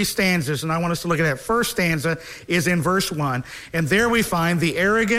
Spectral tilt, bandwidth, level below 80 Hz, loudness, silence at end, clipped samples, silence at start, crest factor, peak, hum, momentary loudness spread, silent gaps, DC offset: -4.5 dB/octave; 16 kHz; -46 dBFS; -21 LUFS; 0 s; under 0.1%; 0 s; 16 dB; -6 dBFS; none; 6 LU; none; under 0.1%